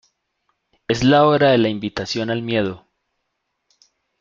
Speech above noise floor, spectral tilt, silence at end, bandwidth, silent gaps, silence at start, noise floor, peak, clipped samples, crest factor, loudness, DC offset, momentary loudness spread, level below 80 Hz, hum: 58 dB; -6 dB/octave; 1.45 s; 7.6 kHz; none; 0.9 s; -75 dBFS; -2 dBFS; under 0.1%; 18 dB; -18 LUFS; under 0.1%; 13 LU; -50 dBFS; none